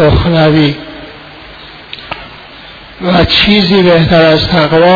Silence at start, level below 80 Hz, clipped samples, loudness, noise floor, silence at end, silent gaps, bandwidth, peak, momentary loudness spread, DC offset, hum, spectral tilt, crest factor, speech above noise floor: 0 s; -26 dBFS; 0.2%; -8 LUFS; -31 dBFS; 0 s; none; 5.4 kHz; 0 dBFS; 23 LU; under 0.1%; none; -7.5 dB/octave; 10 dB; 24 dB